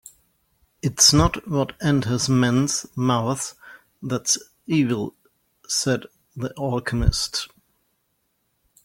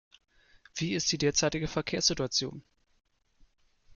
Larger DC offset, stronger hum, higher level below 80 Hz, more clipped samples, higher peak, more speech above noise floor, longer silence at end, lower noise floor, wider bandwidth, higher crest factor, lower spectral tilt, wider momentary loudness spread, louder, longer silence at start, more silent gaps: neither; neither; first, -38 dBFS vs -54 dBFS; neither; first, 0 dBFS vs -12 dBFS; first, 50 dB vs 34 dB; about the same, 1.4 s vs 1.35 s; first, -71 dBFS vs -64 dBFS; first, 17 kHz vs 11 kHz; about the same, 22 dB vs 22 dB; about the same, -4 dB/octave vs -3 dB/octave; first, 15 LU vs 9 LU; first, -22 LUFS vs -29 LUFS; about the same, 0.85 s vs 0.75 s; neither